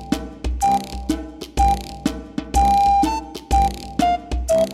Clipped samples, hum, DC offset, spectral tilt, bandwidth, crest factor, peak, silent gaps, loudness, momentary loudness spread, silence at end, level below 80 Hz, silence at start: under 0.1%; none; under 0.1%; -5.5 dB/octave; 15.5 kHz; 14 dB; -6 dBFS; none; -20 LUFS; 11 LU; 0 s; -28 dBFS; 0 s